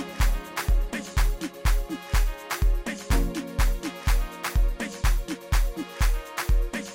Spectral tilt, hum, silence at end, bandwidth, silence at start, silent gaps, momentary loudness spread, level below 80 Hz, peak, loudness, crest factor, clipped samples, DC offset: -4.5 dB/octave; none; 0 s; 17 kHz; 0 s; none; 3 LU; -24 dBFS; -12 dBFS; -28 LUFS; 12 dB; under 0.1%; under 0.1%